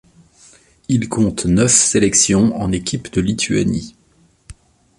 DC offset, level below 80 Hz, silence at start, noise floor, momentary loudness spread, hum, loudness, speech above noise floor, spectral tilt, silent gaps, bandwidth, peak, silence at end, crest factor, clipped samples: under 0.1%; -40 dBFS; 0.9 s; -55 dBFS; 10 LU; none; -15 LUFS; 39 dB; -4 dB/octave; none; 11.5 kHz; 0 dBFS; 0.45 s; 18 dB; under 0.1%